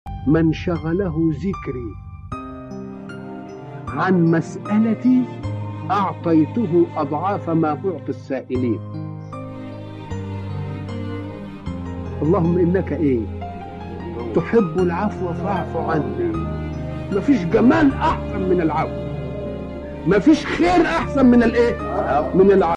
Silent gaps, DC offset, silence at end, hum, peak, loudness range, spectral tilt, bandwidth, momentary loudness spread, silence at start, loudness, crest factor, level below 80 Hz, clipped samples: none; under 0.1%; 0 s; none; -4 dBFS; 9 LU; -8 dB/octave; 9.4 kHz; 17 LU; 0.05 s; -20 LUFS; 16 dB; -38 dBFS; under 0.1%